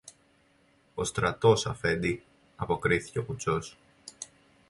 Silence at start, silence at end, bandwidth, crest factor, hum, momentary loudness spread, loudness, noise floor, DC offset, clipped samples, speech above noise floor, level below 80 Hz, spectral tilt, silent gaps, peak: 0.05 s; 0.45 s; 11.5 kHz; 22 dB; none; 20 LU; -29 LUFS; -65 dBFS; under 0.1%; under 0.1%; 37 dB; -52 dBFS; -5 dB/octave; none; -8 dBFS